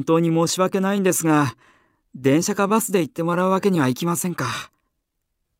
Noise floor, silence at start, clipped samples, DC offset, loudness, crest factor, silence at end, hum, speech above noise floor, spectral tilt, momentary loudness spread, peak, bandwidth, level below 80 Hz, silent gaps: -76 dBFS; 0 s; under 0.1%; under 0.1%; -20 LUFS; 16 dB; 0.95 s; none; 56 dB; -5 dB/octave; 7 LU; -6 dBFS; 16 kHz; -64 dBFS; none